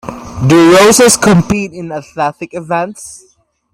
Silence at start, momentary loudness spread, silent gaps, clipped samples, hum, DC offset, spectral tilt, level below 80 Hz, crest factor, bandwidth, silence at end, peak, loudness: 0.05 s; 20 LU; none; under 0.1%; none; under 0.1%; -4.5 dB/octave; -40 dBFS; 10 dB; 16.5 kHz; 0.55 s; 0 dBFS; -9 LUFS